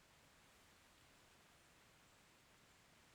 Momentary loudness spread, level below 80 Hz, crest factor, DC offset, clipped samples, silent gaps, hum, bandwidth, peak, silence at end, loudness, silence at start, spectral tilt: 1 LU; -84 dBFS; 14 dB; under 0.1%; under 0.1%; none; none; 19.5 kHz; -56 dBFS; 0 s; -68 LUFS; 0 s; -2.5 dB/octave